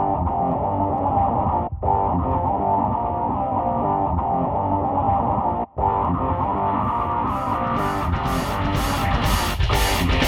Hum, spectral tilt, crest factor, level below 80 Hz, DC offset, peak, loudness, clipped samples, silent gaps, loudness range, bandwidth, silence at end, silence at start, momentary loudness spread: none; -6 dB/octave; 16 dB; -30 dBFS; under 0.1%; -4 dBFS; -22 LUFS; under 0.1%; none; 1 LU; 18.5 kHz; 0 s; 0 s; 3 LU